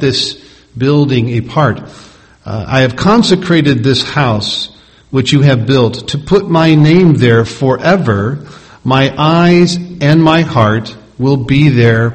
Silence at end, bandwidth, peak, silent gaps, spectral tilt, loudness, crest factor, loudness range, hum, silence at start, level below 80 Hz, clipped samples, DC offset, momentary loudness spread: 0 s; 8.8 kHz; 0 dBFS; none; -6.5 dB/octave; -10 LUFS; 10 dB; 2 LU; none; 0 s; -40 dBFS; 0.5%; under 0.1%; 10 LU